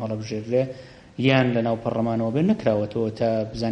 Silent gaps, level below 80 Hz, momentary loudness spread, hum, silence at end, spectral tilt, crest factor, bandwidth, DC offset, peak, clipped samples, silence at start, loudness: none; -52 dBFS; 10 LU; none; 0 s; -7.5 dB/octave; 18 dB; 8.8 kHz; under 0.1%; -4 dBFS; under 0.1%; 0 s; -23 LUFS